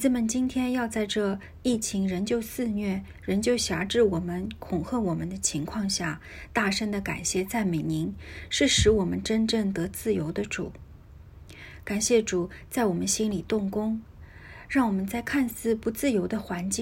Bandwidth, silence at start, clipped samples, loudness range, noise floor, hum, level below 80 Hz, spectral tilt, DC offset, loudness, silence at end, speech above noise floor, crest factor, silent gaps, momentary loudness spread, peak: 16.5 kHz; 0 s; under 0.1%; 3 LU; -48 dBFS; none; -46 dBFS; -4 dB/octave; under 0.1%; -27 LUFS; 0 s; 21 dB; 18 dB; none; 9 LU; -10 dBFS